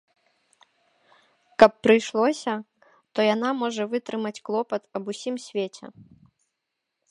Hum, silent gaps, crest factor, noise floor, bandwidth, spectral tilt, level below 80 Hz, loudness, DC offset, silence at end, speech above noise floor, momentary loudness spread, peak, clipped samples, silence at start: none; none; 26 dB; -82 dBFS; 11 kHz; -4.5 dB/octave; -66 dBFS; -24 LUFS; under 0.1%; 1.2 s; 58 dB; 15 LU; 0 dBFS; under 0.1%; 1.6 s